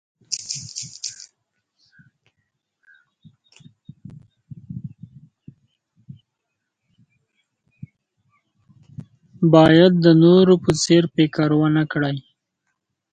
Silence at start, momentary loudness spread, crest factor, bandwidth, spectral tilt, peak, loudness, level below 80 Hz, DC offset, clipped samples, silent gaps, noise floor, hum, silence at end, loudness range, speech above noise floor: 0.3 s; 21 LU; 20 dB; 9.4 kHz; -6 dB/octave; 0 dBFS; -16 LUFS; -56 dBFS; under 0.1%; under 0.1%; none; -79 dBFS; none; 0.9 s; 21 LU; 64 dB